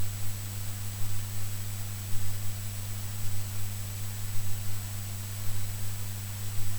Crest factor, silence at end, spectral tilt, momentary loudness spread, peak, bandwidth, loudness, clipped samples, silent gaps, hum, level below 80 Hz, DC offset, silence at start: 14 dB; 0 s; -3.5 dB/octave; 1 LU; -14 dBFS; over 20 kHz; -36 LUFS; under 0.1%; none; none; -42 dBFS; 0.7%; 0 s